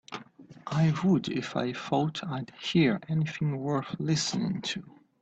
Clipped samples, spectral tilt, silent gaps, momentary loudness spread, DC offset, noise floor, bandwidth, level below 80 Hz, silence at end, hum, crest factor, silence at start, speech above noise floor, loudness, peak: under 0.1%; -5.5 dB/octave; none; 10 LU; under 0.1%; -51 dBFS; 8.6 kHz; -66 dBFS; 0.35 s; none; 16 dB; 0.1 s; 22 dB; -29 LUFS; -12 dBFS